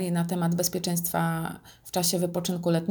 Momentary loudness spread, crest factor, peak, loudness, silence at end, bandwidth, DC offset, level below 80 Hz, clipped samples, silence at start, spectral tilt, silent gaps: 8 LU; 16 dB; -12 dBFS; -27 LUFS; 0 s; over 20 kHz; under 0.1%; -62 dBFS; under 0.1%; 0 s; -4.5 dB/octave; none